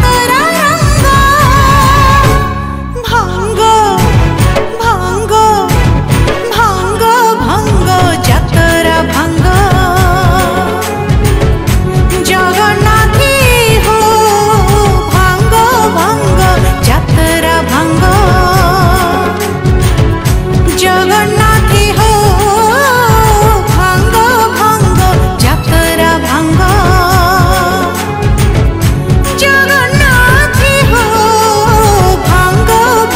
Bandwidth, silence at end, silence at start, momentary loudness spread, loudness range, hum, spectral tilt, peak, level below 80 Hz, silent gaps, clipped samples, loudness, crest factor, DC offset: 16.5 kHz; 0 s; 0 s; 5 LU; 2 LU; none; -5 dB/octave; 0 dBFS; -16 dBFS; none; 0.2%; -8 LUFS; 8 dB; under 0.1%